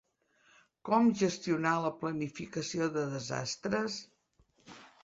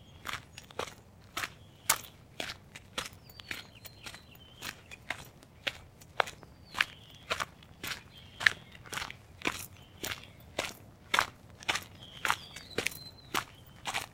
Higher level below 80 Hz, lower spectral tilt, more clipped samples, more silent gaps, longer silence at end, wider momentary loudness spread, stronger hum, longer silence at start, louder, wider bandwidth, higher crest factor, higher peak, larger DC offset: second, -72 dBFS vs -62 dBFS; first, -5 dB/octave vs -1.5 dB/octave; neither; neither; first, 0.15 s vs 0 s; second, 12 LU vs 18 LU; neither; first, 0.85 s vs 0 s; first, -33 LUFS vs -36 LUFS; second, 8 kHz vs 17 kHz; second, 20 dB vs 34 dB; second, -14 dBFS vs -4 dBFS; neither